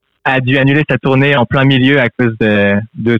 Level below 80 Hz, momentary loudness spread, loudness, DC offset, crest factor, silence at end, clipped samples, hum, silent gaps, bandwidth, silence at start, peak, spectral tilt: -46 dBFS; 4 LU; -11 LUFS; under 0.1%; 10 dB; 0 s; under 0.1%; none; none; 5.8 kHz; 0.25 s; 0 dBFS; -8.5 dB/octave